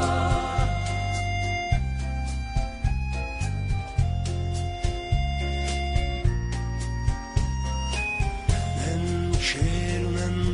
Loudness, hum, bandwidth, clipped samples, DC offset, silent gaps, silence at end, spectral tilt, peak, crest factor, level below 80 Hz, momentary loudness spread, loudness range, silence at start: -27 LUFS; none; 10.5 kHz; under 0.1%; under 0.1%; none; 0 s; -5.5 dB/octave; -10 dBFS; 16 dB; -30 dBFS; 5 LU; 2 LU; 0 s